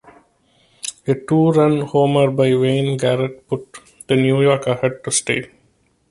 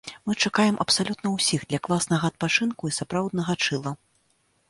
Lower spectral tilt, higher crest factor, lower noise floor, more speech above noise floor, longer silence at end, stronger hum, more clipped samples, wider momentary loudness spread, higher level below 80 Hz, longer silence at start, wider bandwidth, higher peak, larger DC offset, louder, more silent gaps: first, -5.5 dB/octave vs -4 dB/octave; about the same, 16 dB vs 20 dB; second, -60 dBFS vs -68 dBFS; about the same, 44 dB vs 43 dB; about the same, 0.65 s vs 0.75 s; neither; neither; first, 12 LU vs 8 LU; about the same, -56 dBFS vs -60 dBFS; first, 0.85 s vs 0.05 s; about the same, 11.5 kHz vs 11.5 kHz; first, -2 dBFS vs -6 dBFS; neither; first, -17 LUFS vs -24 LUFS; neither